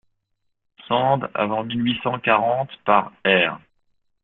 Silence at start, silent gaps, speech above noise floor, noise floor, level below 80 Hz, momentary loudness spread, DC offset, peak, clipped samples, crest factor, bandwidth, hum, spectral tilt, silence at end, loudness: 0.9 s; none; 53 dB; -73 dBFS; -62 dBFS; 5 LU; under 0.1%; -2 dBFS; under 0.1%; 22 dB; 4.2 kHz; none; -9.5 dB/octave; 0.65 s; -21 LUFS